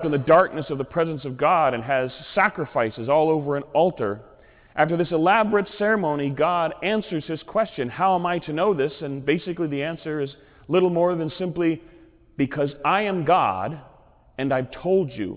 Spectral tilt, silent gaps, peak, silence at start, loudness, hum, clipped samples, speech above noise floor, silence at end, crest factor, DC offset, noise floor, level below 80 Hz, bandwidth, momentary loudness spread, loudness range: -10 dB/octave; none; -6 dBFS; 0 s; -23 LUFS; none; under 0.1%; 24 dB; 0 s; 18 dB; under 0.1%; -46 dBFS; -56 dBFS; 4 kHz; 10 LU; 3 LU